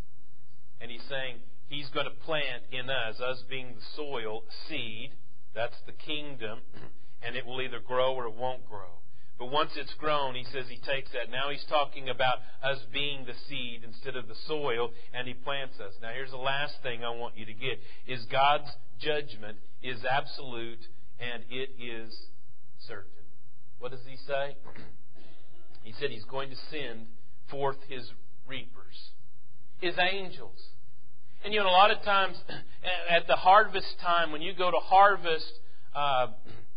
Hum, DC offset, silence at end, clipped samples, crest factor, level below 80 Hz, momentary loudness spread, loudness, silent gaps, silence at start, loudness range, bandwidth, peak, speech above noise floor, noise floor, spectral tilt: none; 5%; 0.15 s; under 0.1%; 24 dB; -62 dBFS; 19 LU; -31 LUFS; none; 0.8 s; 15 LU; 5.2 kHz; -6 dBFS; 33 dB; -64 dBFS; -7.5 dB/octave